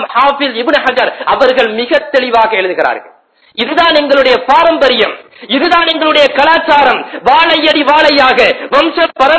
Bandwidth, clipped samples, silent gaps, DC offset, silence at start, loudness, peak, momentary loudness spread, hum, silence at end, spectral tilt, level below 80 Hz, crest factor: 8 kHz; 1%; none; under 0.1%; 0 s; -9 LUFS; 0 dBFS; 7 LU; none; 0 s; -3.5 dB/octave; -46 dBFS; 10 dB